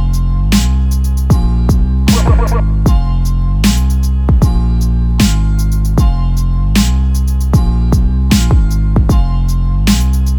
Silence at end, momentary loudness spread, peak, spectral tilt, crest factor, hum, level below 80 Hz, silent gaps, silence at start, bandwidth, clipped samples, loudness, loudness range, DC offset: 0 s; 4 LU; 0 dBFS; -6 dB/octave; 10 dB; none; -12 dBFS; none; 0 s; 19 kHz; under 0.1%; -13 LUFS; 1 LU; under 0.1%